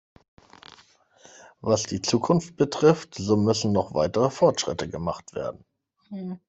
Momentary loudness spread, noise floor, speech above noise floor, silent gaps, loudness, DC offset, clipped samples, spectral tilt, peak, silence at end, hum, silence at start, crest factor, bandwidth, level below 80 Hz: 13 LU; -58 dBFS; 34 dB; none; -24 LUFS; under 0.1%; under 0.1%; -5.5 dB/octave; -4 dBFS; 0.1 s; none; 1.65 s; 22 dB; 8.4 kHz; -58 dBFS